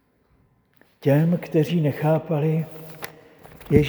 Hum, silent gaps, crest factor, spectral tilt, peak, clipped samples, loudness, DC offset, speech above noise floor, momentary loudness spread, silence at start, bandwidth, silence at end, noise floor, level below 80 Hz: none; none; 22 dB; -8.5 dB/octave; 0 dBFS; under 0.1%; -22 LUFS; under 0.1%; 41 dB; 16 LU; 1.05 s; over 20 kHz; 0 s; -62 dBFS; -46 dBFS